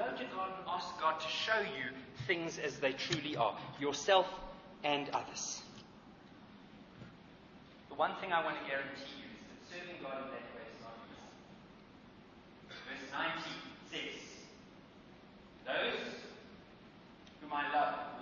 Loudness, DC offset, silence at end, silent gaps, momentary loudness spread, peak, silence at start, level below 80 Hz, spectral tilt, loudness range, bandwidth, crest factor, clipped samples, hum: -38 LUFS; under 0.1%; 0 s; none; 23 LU; -16 dBFS; 0 s; -70 dBFS; -1.5 dB/octave; 10 LU; 7 kHz; 24 dB; under 0.1%; none